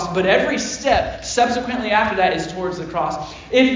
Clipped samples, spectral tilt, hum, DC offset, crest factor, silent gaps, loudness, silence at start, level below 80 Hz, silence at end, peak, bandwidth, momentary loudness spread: under 0.1%; -4 dB/octave; none; under 0.1%; 16 dB; none; -19 LUFS; 0 s; -42 dBFS; 0 s; -2 dBFS; 7.6 kHz; 8 LU